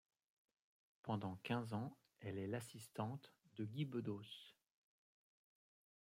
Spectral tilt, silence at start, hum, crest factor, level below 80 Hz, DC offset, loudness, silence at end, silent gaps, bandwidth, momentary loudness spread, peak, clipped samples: -6.5 dB/octave; 1.05 s; none; 22 dB; -88 dBFS; under 0.1%; -48 LUFS; 1.5 s; none; 16 kHz; 12 LU; -28 dBFS; under 0.1%